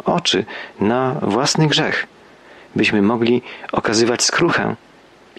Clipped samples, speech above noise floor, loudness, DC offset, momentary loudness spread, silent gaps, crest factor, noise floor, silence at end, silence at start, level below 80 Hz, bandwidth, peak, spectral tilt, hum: under 0.1%; 28 dB; -17 LUFS; under 0.1%; 10 LU; none; 14 dB; -45 dBFS; 0.65 s; 0.05 s; -54 dBFS; 12.5 kHz; -4 dBFS; -4 dB/octave; none